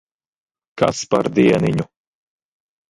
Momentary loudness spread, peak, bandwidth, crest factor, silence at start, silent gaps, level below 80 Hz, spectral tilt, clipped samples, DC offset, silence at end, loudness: 9 LU; -2 dBFS; 11.5 kHz; 20 dB; 0.75 s; none; -52 dBFS; -6 dB/octave; under 0.1%; under 0.1%; 1.05 s; -18 LUFS